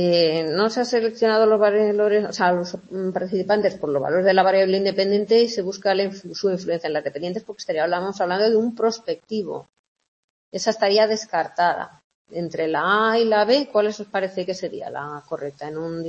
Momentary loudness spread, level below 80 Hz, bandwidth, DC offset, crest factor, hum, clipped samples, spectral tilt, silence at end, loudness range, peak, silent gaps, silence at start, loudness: 13 LU; -68 dBFS; 8.2 kHz; under 0.1%; 18 dB; none; under 0.1%; -5 dB/octave; 0 s; 4 LU; -4 dBFS; 9.79-9.96 s, 10.08-10.52 s, 12.04-12.25 s; 0 s; -21 LUFS